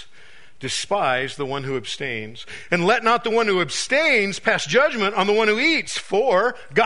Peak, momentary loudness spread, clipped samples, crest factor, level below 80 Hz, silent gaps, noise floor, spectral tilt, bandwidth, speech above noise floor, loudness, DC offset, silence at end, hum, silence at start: -2 dBFS; 10 LU; under 0.1%; 18 dB; -58 dBFS; none; -50 dBFS; -3.5 dB/octave; 11 kHz; 29 dB; -20 LUFS; 1%; 0 s; none; 0 s